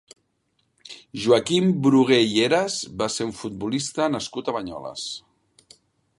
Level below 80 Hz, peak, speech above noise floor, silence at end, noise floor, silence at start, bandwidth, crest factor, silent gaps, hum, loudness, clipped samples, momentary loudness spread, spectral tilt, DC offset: -60 dBFS; -4 dBFS; 49 dB; 1 s; -71 dBFS; 0.9 s; 11.5 kHz; 20 dB; none; none; -22 LUFS; under 0.1%; 15 LU; -4.5 dB/octave; under 0.1%